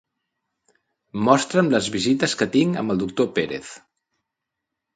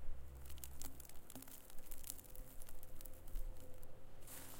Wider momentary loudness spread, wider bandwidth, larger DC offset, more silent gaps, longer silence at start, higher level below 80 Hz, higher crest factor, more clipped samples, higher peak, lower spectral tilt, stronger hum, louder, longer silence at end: first, 12 LU vs 8 LU; second, 9.6 kHz vs 17 kHz; neither; neither; first, 1.15 s vs 0 s; second, -60 dBFS vs -52 dBFS; about the same, 22 dB vs 26 dB; neither; first, -2 dBFS vs -18 dBFS; first, -5 dB/octave vs -3.5 dB/octave; neither; first, -21 LUFS vs -55 LUFS; first, 1.2 s vs 0 s